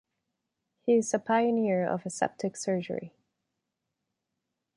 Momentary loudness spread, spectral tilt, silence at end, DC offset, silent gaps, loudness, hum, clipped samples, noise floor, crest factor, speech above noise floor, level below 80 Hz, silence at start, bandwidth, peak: 9 LU; -5.5 dB/octave; 1.7 s; under 0.1%; none; -29 LUFS; none; under 0.1%; -84 dBFS; 18 dB; 57 dB; -76 dBFS; 0.85 s; 11.5 kHz; -12 dBFS